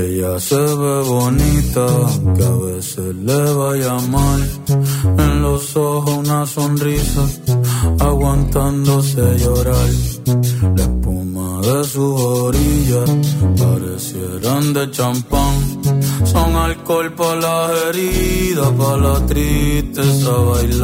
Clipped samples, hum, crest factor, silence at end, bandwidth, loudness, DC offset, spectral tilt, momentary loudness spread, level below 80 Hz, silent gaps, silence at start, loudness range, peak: under 0.1%; none; 14 dB; 0 s; 16.5 kHz; -16 LUFS; under 0.1%; -6 dB/octave; 4 LU; -24 dBFS; none; 0 s; 1 LU; 0 dBFS